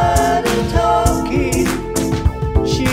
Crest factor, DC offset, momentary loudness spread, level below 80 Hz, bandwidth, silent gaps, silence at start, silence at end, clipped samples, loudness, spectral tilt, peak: 14 dB; 0.2%; 4 LU; -24 dBFS; 16.5 kHz; none; 0 s; 0 s; under 0.1%; -16 LUFS; -5.5 dB/octave; -2 dBFS